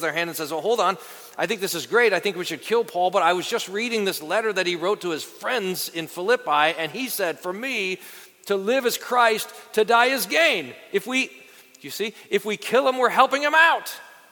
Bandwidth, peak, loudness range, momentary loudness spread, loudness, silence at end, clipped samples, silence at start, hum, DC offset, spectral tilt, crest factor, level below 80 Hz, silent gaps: 19 kHz; -2 dBFS; 3 LU; 11 LU; -22 LUFS; 0.2 s; under 0.1%; 0 s; none; under 0.1%; -2.5 dB/octave; 22 dB; -78 dBFS; none